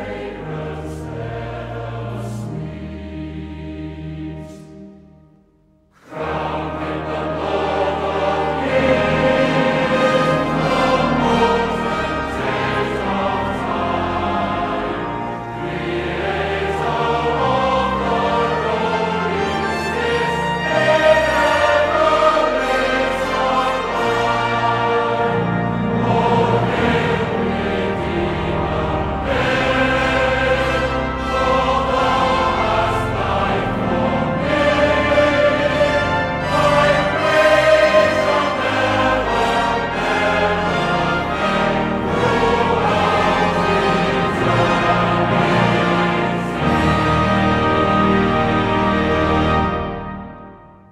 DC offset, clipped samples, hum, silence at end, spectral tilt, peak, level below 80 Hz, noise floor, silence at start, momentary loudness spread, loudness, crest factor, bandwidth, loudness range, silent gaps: under 0.1%; under 0.1%; none; 0.25 s; -6 dB/octave; -2 dBFS; -34 dBFS; -55 dBFS; 0 s; 12 LU; -17 LUFS; 16 dB; 14 kHz; 10 LU; none